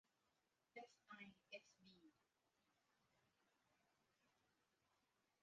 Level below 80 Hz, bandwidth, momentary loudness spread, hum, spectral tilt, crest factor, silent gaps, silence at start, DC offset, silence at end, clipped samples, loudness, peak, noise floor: under -90 dBFS; 7.2 kHz; 3 LU; none; -2 dB/octave; 26 dB; none; 0.05 s; under 0.1%; 0.2 s; under 0.1%; -63 LUFS; -44 dBFS; -88 dBFS